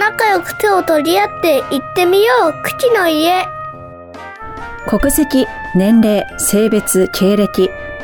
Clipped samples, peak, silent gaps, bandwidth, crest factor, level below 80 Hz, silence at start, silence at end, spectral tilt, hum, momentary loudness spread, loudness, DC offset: under 0.1%; -2 dBFS; none; 19 kHz; 10 dB; -36 dBFS; 0 s; 0 s; -4 dB/octave; none; 17 LU; -13 LUFS; under 0.1%